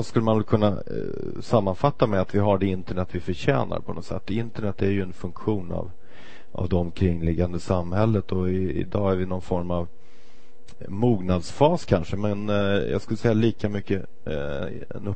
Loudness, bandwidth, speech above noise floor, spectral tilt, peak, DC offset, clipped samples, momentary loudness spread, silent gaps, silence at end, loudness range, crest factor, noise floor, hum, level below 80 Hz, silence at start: -25 LUFS; 8.6 kHz; 31 dB; -8 dB/octave; -4 dBFS; 3%; under 0.1%; 11 LU; none; 0 s; 4 LU; 22 dB; -55 dBFS; none; -44 dBFS; 0 s